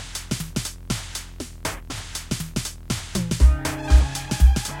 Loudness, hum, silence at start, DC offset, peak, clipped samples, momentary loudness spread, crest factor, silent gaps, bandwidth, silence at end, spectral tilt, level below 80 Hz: -24 LUFS; none; 0 s; under 0.1%; -4 dBFS; under 0.1%; 12 LU; 18 dB; none; 16.5 kHz; 0 s; -4.5 dB/octave; -22 dBFS